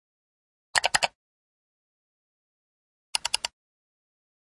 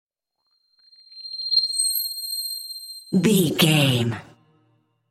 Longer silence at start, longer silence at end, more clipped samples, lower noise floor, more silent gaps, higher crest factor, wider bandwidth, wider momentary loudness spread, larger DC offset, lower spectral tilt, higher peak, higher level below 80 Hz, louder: second, 0.75 s vs 1.15 s; first, 1.05 s vs 0.85 s; neither; first, under -90 dBFS vs -73 dBFS; first, 1.15-3.13 s vs none; first, 32 dB vs 20 dB; second, 11.5 kHz vs 17 kHz; second, 8 LU vs 16 LU; neither; second, 1 dB/octave vs -4 dB/octave; about the same, -2 dBFS vs -4 dBFS; about the same, -66 dBFS vs -64 dBFS; second, -27 LUFS vs -21 LUFS